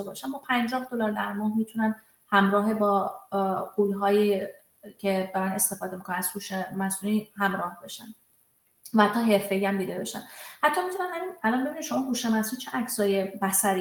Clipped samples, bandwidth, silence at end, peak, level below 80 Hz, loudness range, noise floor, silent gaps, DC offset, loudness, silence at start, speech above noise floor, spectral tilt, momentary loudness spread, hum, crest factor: under 0.1%; 18 kHz; 0 s; -8 dBFS; -70 dBFS; 3 LU; -66 dBFS; none; under 0.1%; -27 LUFS; 0 s; 39 dB; -4 dB/octave; 10 LU; none; 20 dB